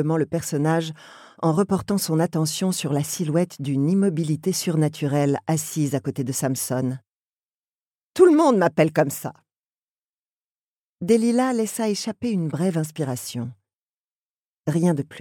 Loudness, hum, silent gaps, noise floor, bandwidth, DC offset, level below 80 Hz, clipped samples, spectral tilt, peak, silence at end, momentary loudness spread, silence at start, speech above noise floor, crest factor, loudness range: -22 LUFS; none; 7.09-8.14 s, 9.57-9.70 s, 9.76-10.96 s, 13.75-14.62 s; under -90 dBFS; 18.5 kHz; under 0.1%; -64 dBFS; under 0.1%; -6 dB/octave; -4 dBFS; 0 s; 11 LU; 0 s; over 68 dB; 20 dB; 4 LU